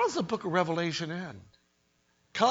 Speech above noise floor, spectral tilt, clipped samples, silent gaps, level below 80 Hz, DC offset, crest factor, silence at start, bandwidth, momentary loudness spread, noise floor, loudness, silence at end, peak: 40 dB; -5 dB/octave; under 0.1%; none; -70 dBFS; under 0.1%; 20 dB; 0 s; 8 kHz; 14 LU; -72 dBFS; -31 LUFS; 0 s; -10 dBFS